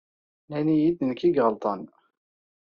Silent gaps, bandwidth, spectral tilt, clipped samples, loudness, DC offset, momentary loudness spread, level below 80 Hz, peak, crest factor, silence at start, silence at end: none; 6.6 kHz; -7 dB/octave; under 0.1%; -25 LUFS; under 0.1%; 11 LU; -66 dBFS; -8 dBFS; 18 dB; 0.5 s; 0.9 s